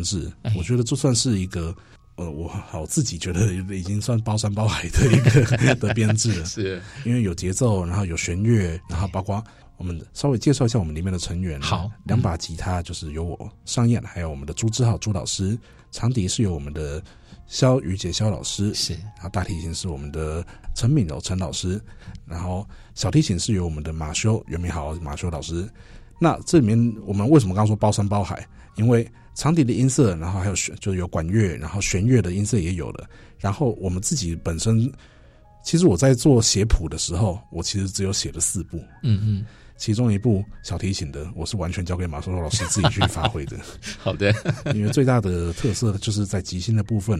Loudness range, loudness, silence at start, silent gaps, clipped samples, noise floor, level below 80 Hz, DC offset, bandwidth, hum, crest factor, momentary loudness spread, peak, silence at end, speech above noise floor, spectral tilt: 5 LU; -23 LUFS; 0 s; none; under 0.1%; -49 dBFS; -36 dBFS; under 0.1%; 13.5 kHz; none; 18 dB; 12 LU; -4 dBFS; 0 s; 27 dB; -5.5 dB/octave